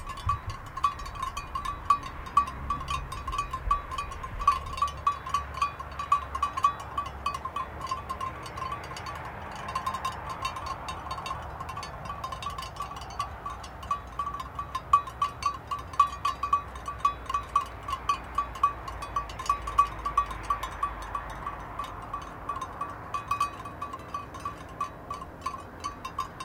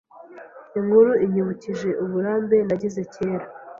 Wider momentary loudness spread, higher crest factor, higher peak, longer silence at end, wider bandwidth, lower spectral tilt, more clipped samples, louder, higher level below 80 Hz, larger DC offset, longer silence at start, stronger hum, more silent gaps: about the same, 11 LU vs 12 LU; first, 24 dB vs 18 dB; second, -8 dBFS vs -4 dBFS; about the same, 0 s vs 0 s; first, 17.5 kHz vs 7.4 kHz; second, -4 dB/octave vs -8.5 dB/octave; neither; second, -32 LUFS vs -22 LUFS; first, -46 dBFS vs -62 dBFS; neither; second, 0 s vs 0.15 s; neither; neither